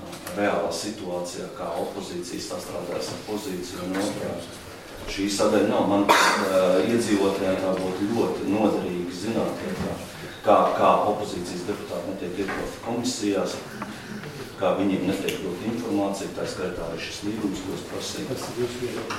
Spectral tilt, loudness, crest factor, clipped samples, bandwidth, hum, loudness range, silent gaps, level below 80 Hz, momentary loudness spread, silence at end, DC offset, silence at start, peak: -4.5 dB/octave; -26 LUFS; 22 dB; under 0.1%; 16.5 kHz; none; 9 LU; none; -52 dBFS; 13 LU; 0 s; under 0.1%; 0 s; -4 dBFS